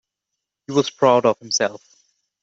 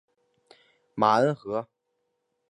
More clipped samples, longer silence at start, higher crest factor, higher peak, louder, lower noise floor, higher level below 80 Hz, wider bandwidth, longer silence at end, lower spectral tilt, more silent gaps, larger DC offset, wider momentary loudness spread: neither; second, 0.7 s vs 0.95 s; about the same, 18 dB vs 22 dB; first, -2 dBFS vs -6 dBFS; first, -19 LUFS vs -25 LUFS; first, -82 dBFS vs -78 dBFS; about the same, -68 dBFS vs -72 dBFS; second, 8 kHz vs 11 kHz; second, 0.65 s vs 0.85 s; second, -3.5 dB/octave vs -6.5 dB/octave; neither; neither; second, 7 LU vs 20 LU